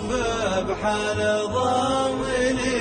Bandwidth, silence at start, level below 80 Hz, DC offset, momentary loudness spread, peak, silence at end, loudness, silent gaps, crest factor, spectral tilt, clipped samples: 9.6 kHz; 0 s; -42 dBFS; under 0.1%; 3 LU; -10 dBFS; 0 s; -23 LUFS; none; 14 dB; -4 dB/octave; under 0.1%